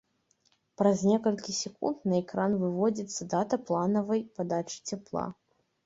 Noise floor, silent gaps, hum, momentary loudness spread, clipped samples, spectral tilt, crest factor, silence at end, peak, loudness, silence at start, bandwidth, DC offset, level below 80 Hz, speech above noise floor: -71 dBFS; none; none; 10 LU; under 0.1%; -5.5 dB/octave; 20 dB; 0.5 s; -10 dBFS; -30 LUFS; 0.8 s; 8 kHz; under 0.1%; -68 dBFS; 42 dB